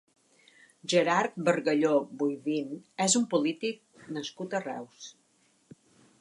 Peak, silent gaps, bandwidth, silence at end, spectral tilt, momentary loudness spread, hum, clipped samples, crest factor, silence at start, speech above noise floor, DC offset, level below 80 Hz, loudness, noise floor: -12 dBFS; none; 11.5 kHz; 1.1 s; -3.5 dB/octave; 16 LU; none; under 0.1%; 20 dB; 0.85 s; 39 dB; under 0.1%; -82 dBFS; -29 LUFS; -68 dBFS